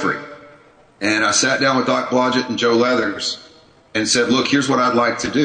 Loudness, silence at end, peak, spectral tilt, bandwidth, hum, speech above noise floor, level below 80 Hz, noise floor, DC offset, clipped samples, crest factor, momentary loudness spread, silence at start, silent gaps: -17 LUFS; 0 s; -4 dBFS; -3 dB/octave; 9.6 kHz; none; 31 dB; -56 dBFS; -48 dBFS; under 0.1%; under 0.1%; 16 dB; 9 LU; 0 s; none